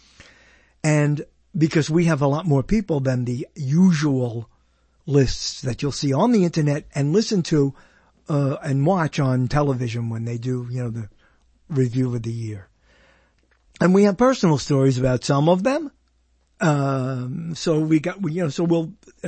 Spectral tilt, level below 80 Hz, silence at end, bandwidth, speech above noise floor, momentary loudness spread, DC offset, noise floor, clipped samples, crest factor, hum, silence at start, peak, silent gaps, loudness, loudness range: -6.5 dB/octave; -44 dBFS; 0 s; 8.8 kHz; 43 dB; 10 LU; under 0.1%; -63 dBFS; under 0.1%; 18 dB; none; 0.85 s; -4 dBFS; none; -21 LUFS; 5 LU